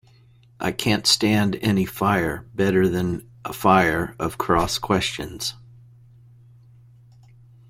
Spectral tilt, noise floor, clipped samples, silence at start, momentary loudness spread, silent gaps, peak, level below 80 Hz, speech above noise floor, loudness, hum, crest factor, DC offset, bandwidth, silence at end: -4.5 dB/octave; -53 dBFS; under 0.1%; 0.6 s; 11 LU; none; -4 dBFS; -46 dBFS; 32 dB; -21 LUFS; none; 20 dB; under 0.1%; 16.5 kHz; 2.1 s